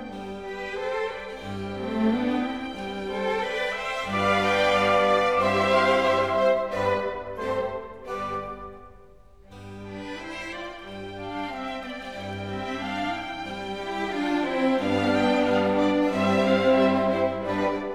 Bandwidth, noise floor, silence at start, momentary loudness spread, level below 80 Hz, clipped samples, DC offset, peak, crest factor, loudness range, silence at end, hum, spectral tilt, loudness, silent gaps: 13 kHz; -52 dBFS; 0 s; 15 LU; -54 dBFS; under 0.1%; 0.2%; -8 dBFS; 16 dB; 13 LU; 0 s; none; -5.5 dB/octave; -25 LUFS; none